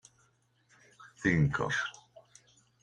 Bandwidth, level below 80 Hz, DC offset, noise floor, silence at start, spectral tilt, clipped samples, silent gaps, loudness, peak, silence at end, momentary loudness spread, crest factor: 10 kHz; -58 dBFS; under 0.1%; -70 dBFS; 1 s; -6 dB/octave; under 0.1%; none; -31 LUFS; -12 dBFS; 0.9 s; 7 LU; 22 dB